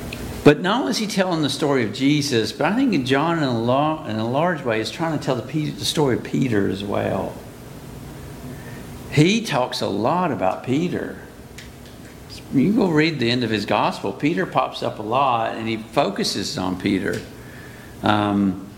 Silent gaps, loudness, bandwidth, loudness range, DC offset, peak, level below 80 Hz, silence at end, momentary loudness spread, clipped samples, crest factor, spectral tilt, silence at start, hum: none; -21 LUFS; 17 kHz; 4 LU; under 0.1%; 0 dBFS; -48 dBFS; 0 s; 19 LU; under 0.1%; 20 dB; -5.5 dB/octave; 0 s; none